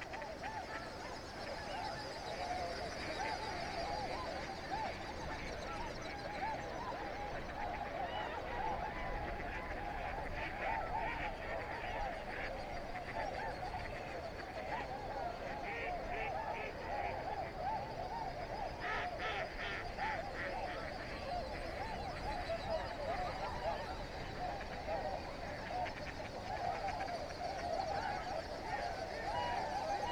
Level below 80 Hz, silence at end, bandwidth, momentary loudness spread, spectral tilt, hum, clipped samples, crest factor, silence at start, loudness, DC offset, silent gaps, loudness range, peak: -52 dBFS; 0 s; 19.5 kHz; 5 LU; -4.5 dB/octave; none; under 0.1%; 16 dB; 0 s; -42 LUFS; under 0.1%; none; 2 LU; -26 dBFS